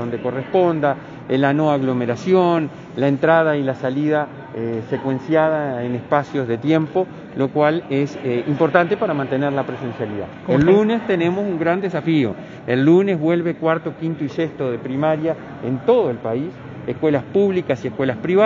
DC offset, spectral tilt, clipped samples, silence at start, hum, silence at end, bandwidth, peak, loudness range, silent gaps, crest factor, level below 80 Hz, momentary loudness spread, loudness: under 0.1%; -8 dB/octave; under 0.1%; 0 s; none; 0 s; 7.4 kHz; 0 dBFS; 3 LU; none; 18 dB; -56 dBFS; 10 LU; -19 LUFS